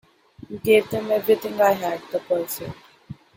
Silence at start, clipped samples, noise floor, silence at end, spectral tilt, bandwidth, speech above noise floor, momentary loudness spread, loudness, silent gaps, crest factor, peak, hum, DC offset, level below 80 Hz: 0.5 s; under 0.1%; -43 dBFS; 0.25 s; -4.5 dB/octave; 17 kHz; 21 dB; 16 LU; -22 LUFS; none; 18 dB; -4 dBFS; none; under 0.1%; -60 dBFS